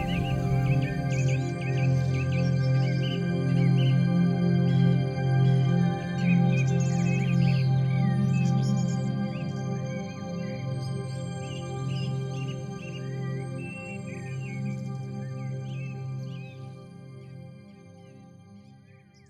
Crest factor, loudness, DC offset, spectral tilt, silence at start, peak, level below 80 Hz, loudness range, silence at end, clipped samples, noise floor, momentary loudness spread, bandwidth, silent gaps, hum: 14 dB; -27 LUFS; under 0.1%; -7.5 dB/octave; 0 s; -12 dBFS; -52 dBFS; 13 LU; 0.55 s; under 0.1%; -54 dBFS; 13 LU; 8.8 kHz; none; none